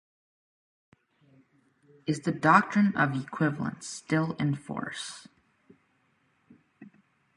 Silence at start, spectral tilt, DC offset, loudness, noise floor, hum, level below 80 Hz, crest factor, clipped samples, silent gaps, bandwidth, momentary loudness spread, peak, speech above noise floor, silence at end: 2.05 s; -6 dB/octave; under 0.1%; -28 LUFS; -70 dBFS; none; -68 dBFS; 26 dB; under 0.1%; none; 11 kHz; 17 LU; -6 dBFS; 43 dB; 0.5 s